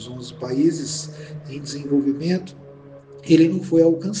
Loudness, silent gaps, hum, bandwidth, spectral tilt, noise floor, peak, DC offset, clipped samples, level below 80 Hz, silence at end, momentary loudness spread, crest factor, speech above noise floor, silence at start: -20 LUFS; none; none; 9.6 kHz; -6 dB/octave; -43 dBFS; -2 dBFS; under 0.1%; under 0.1%; -60 dBFS; 0 s; 18 LU; 18 dB; 22 dB; 0 s